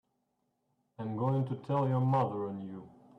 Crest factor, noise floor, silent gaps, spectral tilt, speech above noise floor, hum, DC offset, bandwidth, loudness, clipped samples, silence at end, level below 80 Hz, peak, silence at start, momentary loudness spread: 14 dB; -80 dBFS; none; -10.5 dB/octave; 48 dB; none; under 0.1%; 4.6 kHz; -33 LUFS; under 0.1%; 0.3 s; -72 dBFS; -20 dBFS; 1 s; 14 LU